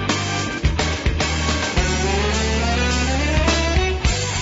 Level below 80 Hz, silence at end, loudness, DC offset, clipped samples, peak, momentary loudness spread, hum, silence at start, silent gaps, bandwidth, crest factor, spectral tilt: -24 dBFS; 0 s; -20 LUFS; under 0.1%; under 0.1%; -6 dBFS; 3 LU; none; 0 s; none; 8 kHz; 14 dB; -4 dB/octave